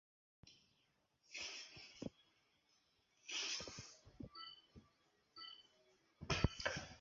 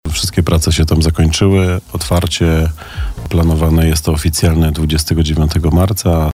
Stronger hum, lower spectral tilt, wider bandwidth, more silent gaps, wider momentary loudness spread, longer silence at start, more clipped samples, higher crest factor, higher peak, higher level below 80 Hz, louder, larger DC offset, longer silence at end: neither; second, -3 dB/octave vs -5.5 dB/octave; second, 7.4 kHz vs 16 kHz; neither; first, 22 LU vs 5 LU; first, 0.45 s vs 0.05 s; neither; first, 30 dB vs 10 dB; second, -20 dBFS vs -2 dBFS; second, -60 dBFS vs -20 dBFS; second, -47 LUFS vs -13 LUFS; neither; about the same, 0 s vs 0 s